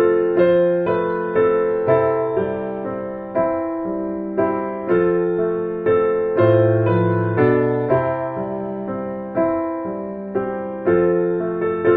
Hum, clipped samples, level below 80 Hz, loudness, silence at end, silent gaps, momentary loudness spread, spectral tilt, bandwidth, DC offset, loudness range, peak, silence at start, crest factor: none; under 0.1%; -52 dBFS; -19 LUFS; 0 s; none; 10 LU; -8 dB/octave; 4.3 kHz; under 0.1%; 4 LU; -2 dBFS; 0 s; 16 dB